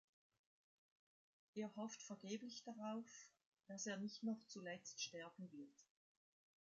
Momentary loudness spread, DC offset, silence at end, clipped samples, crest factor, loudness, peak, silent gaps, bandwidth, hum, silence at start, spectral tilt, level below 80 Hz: 11 LU; under 0.1%; 0.95 s; under 0.1%; 18 dB; -52 LUFS; -36 dBFS; 3.46-3.52 s; 7.6 kHz; none; 1.55 s; -4 dB/octave; under -90 dBFS